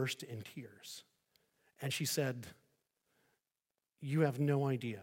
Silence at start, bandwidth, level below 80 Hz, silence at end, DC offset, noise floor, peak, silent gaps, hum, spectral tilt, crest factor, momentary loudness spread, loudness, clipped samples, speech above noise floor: 0 s; 17 kHz; -82 dBFS; 0 s; under 0.1%; under -90 dBFS; -18 dBFS; none; none; -5 dB/octave; 20 dB; 17 LU; -37 LUFS; under 0.1%; over 53 dB